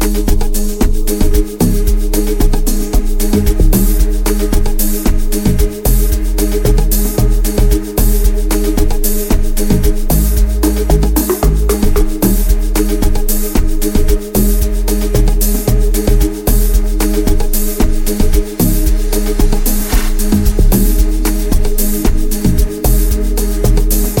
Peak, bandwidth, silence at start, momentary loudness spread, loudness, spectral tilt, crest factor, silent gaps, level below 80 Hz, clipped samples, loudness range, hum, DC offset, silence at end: 0 dBFS; 17 kHz; 0 s; 3 LU; -14 LUFS; -5.5 dB/octave; 10 dB; none; -12 dBFS; under 0.1%; 1 LU; none; under 0.1%; 0 s